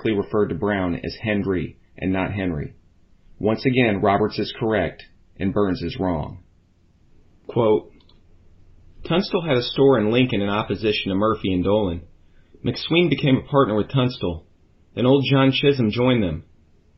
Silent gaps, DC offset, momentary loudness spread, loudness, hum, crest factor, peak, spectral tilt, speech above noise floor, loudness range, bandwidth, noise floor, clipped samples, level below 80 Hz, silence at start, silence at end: none; under 0.1%; 11 LU; -21 LUFS; none; 18 dB; -4 dBFS; -5 dB/octave; 37 dB; 6 LU; 5.8 kHz; -57 dBFS; under 0.1%; -46 dBFS; 0 s; 0.55 s